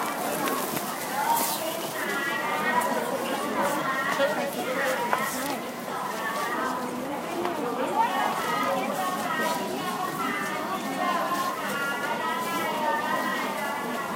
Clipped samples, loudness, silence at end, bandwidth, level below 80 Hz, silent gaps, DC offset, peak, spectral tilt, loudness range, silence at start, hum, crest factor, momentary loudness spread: under 0.1%; -27 LUFS; 0 s; 16 kHz; -70 dBFS; none; under 0.1%; -8 dBFS; -3 dB/octave; 2 LU; 0 s; none; 20 dB; 5 LU